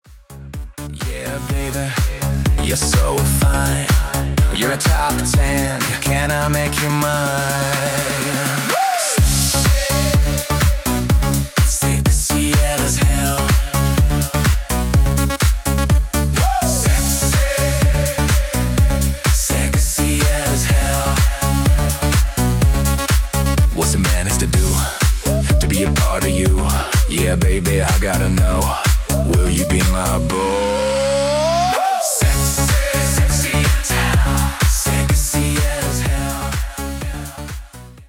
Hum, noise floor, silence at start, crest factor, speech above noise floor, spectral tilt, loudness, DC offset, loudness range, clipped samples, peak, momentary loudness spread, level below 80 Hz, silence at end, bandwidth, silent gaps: none; -36 dBFS; 0.1 s; 14 dB; 20 dB; -4.5 dB/octave; -17 LUFS; under 0.1%; 1 LU; under 0.1%; -2 dBFS; 4 LU; -20 dBFS; 0.05 s; 18 kHz; none